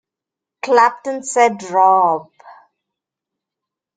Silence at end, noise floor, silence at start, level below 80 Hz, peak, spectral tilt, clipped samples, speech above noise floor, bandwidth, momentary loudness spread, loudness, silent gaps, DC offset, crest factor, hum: 1.45 s; -85 dBFS; 0.65 s; -72 dBFS; -2 dBFS; -3 dB/octave; under 0.1%; 71 dB; 9.4 kHz; 12 LU; -15 LUFS; none; under 0.1%; 18 dB; none